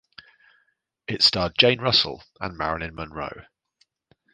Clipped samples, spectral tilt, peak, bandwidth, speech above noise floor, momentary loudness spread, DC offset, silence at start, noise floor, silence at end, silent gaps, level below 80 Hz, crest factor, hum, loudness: under 0.1%; -4 dB/octave; 0 dBFS; 9.6 kHz; 46 dB; 16 LU; under 0.1%; 1.1 s; -70 dBFS; 0.95 s; none; -50 dBFS; 26 dB; none; -21 LUFS